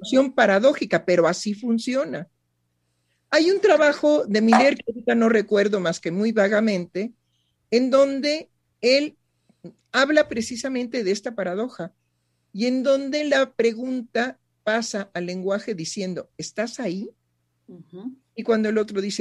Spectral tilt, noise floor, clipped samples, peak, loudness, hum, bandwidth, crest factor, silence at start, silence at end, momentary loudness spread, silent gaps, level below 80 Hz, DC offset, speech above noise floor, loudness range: -4.5 dB/octave; -72 dBFS; under 0.1%; -4 dBFS; -22 LUFS; 60 Hz at -60 dBFS; 11.5 kHz; 20 dB; 0 s; 0 s; 14 LU; none; -68 dBFS; under 0.1%; 51 dB; 9 LU